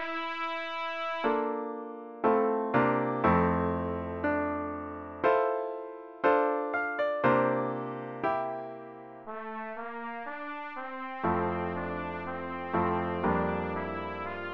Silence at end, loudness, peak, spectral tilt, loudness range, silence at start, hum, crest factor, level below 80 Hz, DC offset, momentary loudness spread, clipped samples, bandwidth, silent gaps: 0 s; -31 LUFS; -10 dBFS; -8.5 dB/octave; 7 LU; 0 s; none; 20 dB; -56 dBFS; under 0.1%; 12 LU; under 0.1%; 6.6 kHz; none